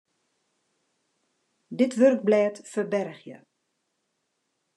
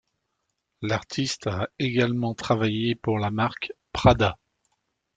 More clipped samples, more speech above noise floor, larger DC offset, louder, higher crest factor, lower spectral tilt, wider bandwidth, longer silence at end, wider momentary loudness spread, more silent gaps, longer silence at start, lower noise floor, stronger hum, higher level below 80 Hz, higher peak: neither; about the same, 54 dB vs 54 dB; neither; about the same, -24 LUFS vs -25 LUFS; about the same, 20 dB vs 24 dB; about the same, -6 dB/octave vs -6 dB/octave; first, 11 kHz vs 9.2 kHz; first, 1.45 s vs 0.8 s; first, 18 LU vs 10 LU; neither; first, 1.7 s vs 0.8 s; about the same, -77 dBFS vs -78 dBFS; neither; second, -88 dBFS vs -46 dBFS; second, -8 dBFS vs -2 dBFS